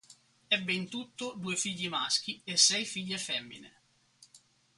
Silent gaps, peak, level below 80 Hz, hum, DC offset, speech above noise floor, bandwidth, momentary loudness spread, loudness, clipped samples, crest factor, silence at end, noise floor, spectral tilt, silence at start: none; -10 dBFS; -78 dBFS; none; under 0.1%; 30 dB; 11.5 kHz; 15 LU; -30 LUFS; under 0.1%; 26 dB; 0.4 s; -63 dBFS; -1 dB/octave; 0.1 s